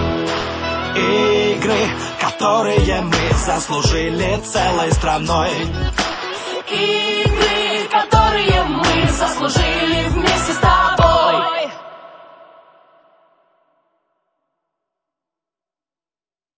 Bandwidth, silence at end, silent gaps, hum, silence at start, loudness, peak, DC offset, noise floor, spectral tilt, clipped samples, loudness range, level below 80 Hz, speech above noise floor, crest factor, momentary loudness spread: 8 kHz; 4.15 s; none; none; 0 s; -16 LUFS; 0 dBFS; under 0.1%; under -90 dBFS; -4.5 dB/octave; under 0.1%; 3 LU; -28 dBFS; over 73 dB; 18 dB; 8 LU